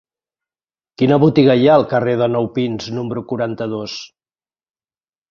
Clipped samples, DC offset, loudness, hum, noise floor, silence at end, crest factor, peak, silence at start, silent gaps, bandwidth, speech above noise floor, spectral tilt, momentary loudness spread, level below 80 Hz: under 0.1%; under 0.1%; -16 LUFS; none; under -90 dBFS; 1.25 s; 16 dB; -2 dBFS; 1 s; none; 7.2 kHz; over 75 dB; -7.5 dB/octave; 12 LU; -56 dBFS